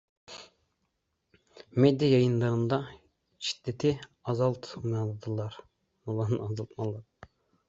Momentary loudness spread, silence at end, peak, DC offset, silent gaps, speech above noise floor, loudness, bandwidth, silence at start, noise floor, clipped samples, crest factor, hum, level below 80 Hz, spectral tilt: 21 LU; 0.65 s; -10 dBFS; under 0.1%; none; 51 dB; -30 LUFS; 7.8 kHz; 0.3 s; -79 dBFS; under 0.1%; 22 dB; none; -64 dBFS; -7 dB/octave